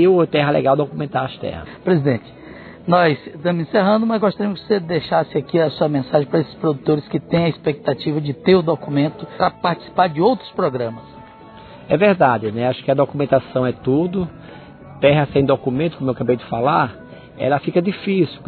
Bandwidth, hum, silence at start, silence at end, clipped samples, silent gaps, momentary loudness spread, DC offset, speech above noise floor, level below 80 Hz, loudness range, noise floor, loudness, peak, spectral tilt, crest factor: 4.6 kHz; none; 0 s; 0 s; under 0.1%; none; 9 LU; under 0.1%; 23 dB; -52 dBFS; 1 LU; -40 dBFS; -19 LUFS; 0 dBFS; -10.5 dB/octave; 18 dB